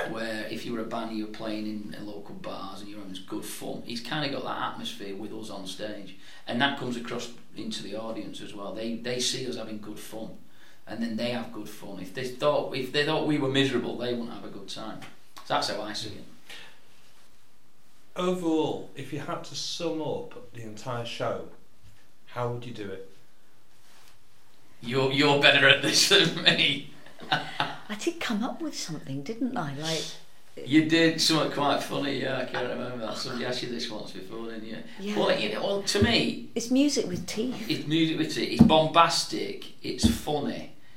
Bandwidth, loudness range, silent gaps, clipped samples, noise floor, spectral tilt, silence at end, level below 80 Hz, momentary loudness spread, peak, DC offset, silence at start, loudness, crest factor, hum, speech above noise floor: 16 kHz; 14 LU; none; under 0.1%; -64 dBFS; -4 dB/octave; 0.25 s; -54 dBFS; 20 LU; 0 dBFS; 1%; 0 s; -27 LUFS; 28 dB; none; 36 dB